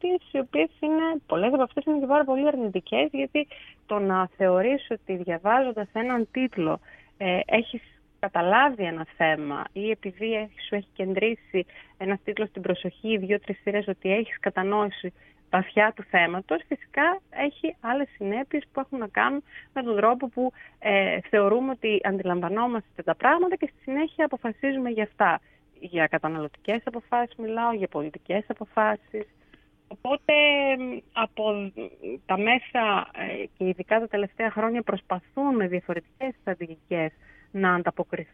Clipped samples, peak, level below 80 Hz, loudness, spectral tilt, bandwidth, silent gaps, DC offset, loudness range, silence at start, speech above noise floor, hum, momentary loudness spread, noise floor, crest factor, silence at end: under 0.1%; -6 dBFS; -64 dBFS; -26 LUFS; -8 dB/octave; 4 kHz; none; under 0.1%; 4 LU; 0.05 s; 32 dB; none; 10 LU; -58 dBFS; 20 dB; 0.1 s